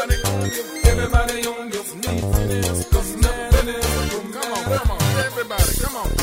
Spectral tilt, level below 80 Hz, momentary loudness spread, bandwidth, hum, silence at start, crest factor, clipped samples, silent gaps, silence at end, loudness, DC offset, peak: -4.5 dB/octave; -22 dBFS; 6 LU; 16.5 kHz; none; 0 s; 18 dB; under 0.1%; none; 0 s; -21 LUFS; under 0.1%; -2 dBFS